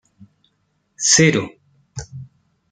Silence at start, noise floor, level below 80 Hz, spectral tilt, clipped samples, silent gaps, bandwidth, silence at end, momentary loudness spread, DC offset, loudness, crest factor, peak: 1 s; -67 dBFS; -54 dBFS; -3 dB/octave; under 0.1%; none; 10 kHz; 0.45 s; 25 LU; under 0.1%; -15 LUFS; 20 dB; -2 dBFS